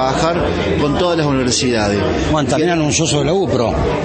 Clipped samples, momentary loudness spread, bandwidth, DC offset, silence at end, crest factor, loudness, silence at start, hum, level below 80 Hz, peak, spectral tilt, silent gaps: under 0.1%; 2 LU; 8.8 kHz; under 0.1%; 0 s; 14 dB; -15 LUFS; 0 s; none; -30 dBFS; -2 dBFS; -4.5 dB/octave; none